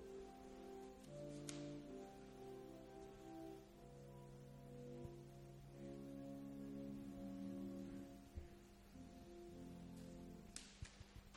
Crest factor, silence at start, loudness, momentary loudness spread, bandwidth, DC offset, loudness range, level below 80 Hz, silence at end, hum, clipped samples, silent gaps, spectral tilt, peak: 24 dB; 0 s; -56 LUFS; 8 LU; 16.5 kHz; under 0.1%; 4 LU; -68 dBFS; 0 s; none; under 0.1%; none; -6 dB/octave; -32 dBFS